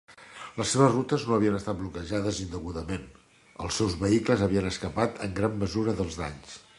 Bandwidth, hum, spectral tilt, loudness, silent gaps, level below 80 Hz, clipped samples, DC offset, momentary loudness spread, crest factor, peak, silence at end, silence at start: 11.5 kHz; none; -5.5 dB/octave; -28 LUFS; none; -46 dBFS; under 0.1%; under 0.1%; 14 LU; 22 dB; -8 dBFS; 0.2 s; 0.1 s